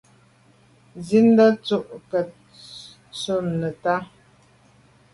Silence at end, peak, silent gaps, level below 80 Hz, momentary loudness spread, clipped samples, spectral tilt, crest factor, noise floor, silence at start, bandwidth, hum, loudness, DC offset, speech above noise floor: 1.1 s; -6 dBFS; none; -62 dBFS; 24 LU; under 0.1%; -6.5 dB/octave; 18 dB; -56 dBFS; 0.95 s; 11.5 kHz; none; -21 LUFS; under 0.1%; 36 dB